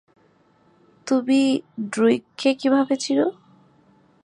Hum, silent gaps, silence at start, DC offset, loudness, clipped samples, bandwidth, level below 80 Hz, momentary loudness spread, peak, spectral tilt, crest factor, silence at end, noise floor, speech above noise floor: none; none; 1.05 s; under 0.1%; -21 LUFS; under 0.1%; 10.5 kHz; -76 dBFS; 7 LU; -6 dBFS; -4.5 dB/octave; 16 dB; 0.9 s; -59 dBFS; 39 dB